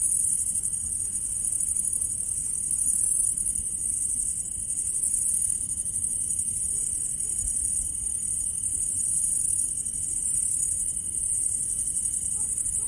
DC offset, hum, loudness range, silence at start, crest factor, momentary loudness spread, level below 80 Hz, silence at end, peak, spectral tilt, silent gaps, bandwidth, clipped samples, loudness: under 0.1%; none; 1 LU; 0 s; 18 dB; 4 LU; -48 dBFS; 0 s; -10 dBFS; -1 dB/octave; none; 11.5 kHz; under 0.1%; -24 LUFS